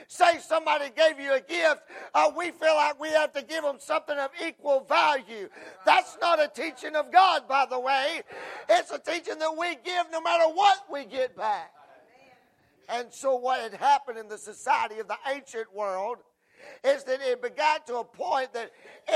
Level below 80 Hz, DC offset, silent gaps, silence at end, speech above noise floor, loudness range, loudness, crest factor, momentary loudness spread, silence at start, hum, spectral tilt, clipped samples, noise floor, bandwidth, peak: -82 dBFS; under 0.1%; none; 0 s; 37 dB; 6 LU; -26 LUFS; 22 dB; 13 LU; 0 s; none; -1 dB/octave; under 0.1%; -63 dBFS; 13.5 kHz; -6 dBFS